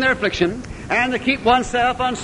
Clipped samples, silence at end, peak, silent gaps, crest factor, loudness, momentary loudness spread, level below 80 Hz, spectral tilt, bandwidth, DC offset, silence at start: under 0.1%; 0 s; -2 dBFS; none; 16 dB; -19 LUFS; 5 LU; -40 dBFS; -4 dB/octave; 11 kHz; under 0.1%; 0 s